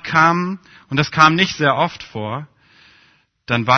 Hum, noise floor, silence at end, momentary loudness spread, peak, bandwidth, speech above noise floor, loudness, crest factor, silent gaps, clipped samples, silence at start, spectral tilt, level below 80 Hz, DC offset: none; -56 dBFS; 0 s; 15 LU; 0 dBFS; 6.6 kHz; 39 dB; -17 LUFS; 18 dB; none; under 0.1%; 0.05 s; -5 dB/octave; -54 dBFS; under 0.1%